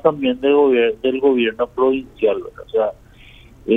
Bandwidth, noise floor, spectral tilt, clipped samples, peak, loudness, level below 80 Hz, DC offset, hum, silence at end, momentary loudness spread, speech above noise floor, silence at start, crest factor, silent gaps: 3.9 kHz; -44 dBFS; -7 dB/octave; under 0.1%; -2 dBFS; -18 LUFS; -50 dBFS; under 0.1%; none; 0 s; 9 LU; 27 dB; 0.05 s; 16 dB; none